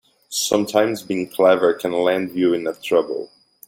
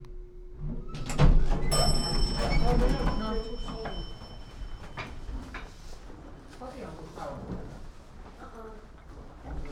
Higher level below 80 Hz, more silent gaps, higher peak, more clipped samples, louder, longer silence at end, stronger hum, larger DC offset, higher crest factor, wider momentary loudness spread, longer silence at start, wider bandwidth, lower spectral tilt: second, -64 dBFS vs -32 dBFS; neither; first, -2 dBFS vs -10 dBFS; neither; first, -19 LUFS vs -32 LUFS; first, 0.4 s vs 0 s; neither; neither; about the same, 18 dB vs 20 dB; second, 11 LU vs 22 LU; first, 0.3 s vs 0 s; about the same, 17 kHz vs 15.5 kHz; about the same, -4 dB/octave vs -5 dB/octave